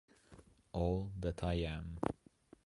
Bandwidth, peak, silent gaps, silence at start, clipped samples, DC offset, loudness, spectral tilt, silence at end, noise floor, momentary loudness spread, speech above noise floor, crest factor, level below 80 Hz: 11.5 kHz; -18 dBFS; none; 0.3 s; under 0.1%; under 0.1%; -40 LUFS; -7.5 dB/octave; 0.55 s; -63 dBFS; 6 LU; 25 dB; 24 dB; -50 dBFS